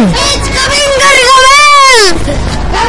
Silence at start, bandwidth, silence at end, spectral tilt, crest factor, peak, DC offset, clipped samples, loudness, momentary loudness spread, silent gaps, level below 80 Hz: 0 s; 12 kHz; 0 s; -2.5 dB/octave; 6 dB; 0 dBFS; under 0.1%; 3%; -4 LUFS; 12 LU; none; -20 dBFS